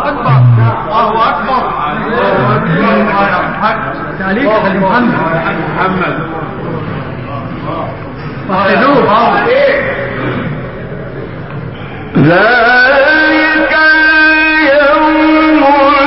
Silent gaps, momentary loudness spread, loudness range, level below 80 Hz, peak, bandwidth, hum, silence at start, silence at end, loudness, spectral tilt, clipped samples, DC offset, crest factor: none; 15 LU; 8 LU; -36 dBFS; 0 dBFS; 5.8 kHz; none; 0 s; 0 s; -9 LUFS; -4 dB/octave; under 0.1%; 1%; 10 dB